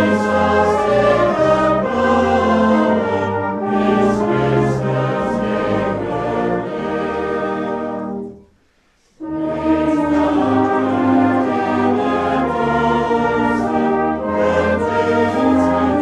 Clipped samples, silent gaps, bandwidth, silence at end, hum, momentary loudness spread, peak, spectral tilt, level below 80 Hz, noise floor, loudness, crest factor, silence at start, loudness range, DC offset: under 0.1%; none; 10.5 kHz; 0 s; none; 7 LU; -2 dBFS; -7 dB/octave; -42 dBFS; -57 dBFS; -17 LUFS; 14 dB; 0 s; 6 LU; under 0.1%